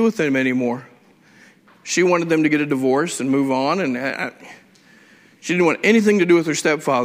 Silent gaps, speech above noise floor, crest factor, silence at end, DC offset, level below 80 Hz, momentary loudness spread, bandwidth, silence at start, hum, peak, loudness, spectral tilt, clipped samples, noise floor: none; 33 dB; 16 dB; 0 s; under 0.1%; -66 dBFS; 10 LU; 16 kHz; 0 s; none; -4 dBFS; -18 LUFS; -5 dB/octave; under 0.1%; -51 dBFS